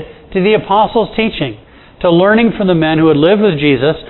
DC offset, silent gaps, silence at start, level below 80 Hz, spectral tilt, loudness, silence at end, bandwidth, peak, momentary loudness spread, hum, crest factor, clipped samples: under 0.1%; none; 0 s; -40 dBFS; -10 dB/octave; -12 LUFS; 0 s; 4.2 kHz; 0 dBFS; 8 LU; none; 12 dB; under 0.1%